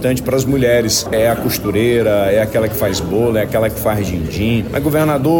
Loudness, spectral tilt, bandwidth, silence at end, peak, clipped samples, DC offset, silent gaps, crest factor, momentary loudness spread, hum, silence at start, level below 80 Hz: -15 LUFS; -5 dB/octave; 17 kHz; 0 s; -4 dBFS; under 0.1%; under 0.1%; none; 10 dB; 4 LU; none; 0 s; -34 dBFS